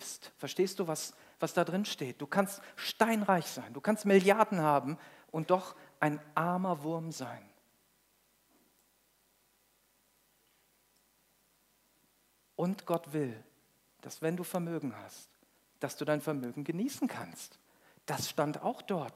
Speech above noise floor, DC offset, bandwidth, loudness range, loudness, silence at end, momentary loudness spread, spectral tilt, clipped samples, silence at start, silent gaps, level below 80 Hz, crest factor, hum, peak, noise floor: 38 dB; under 0.1%; 16 kHz; 11 LU; -34 LUFS; 0.05 s; 18 LU; -5 dB/octave; under 0.1%; 0 s; none; -84 dBFS; 26 dB; none; -10 dBFS; -72 dBFS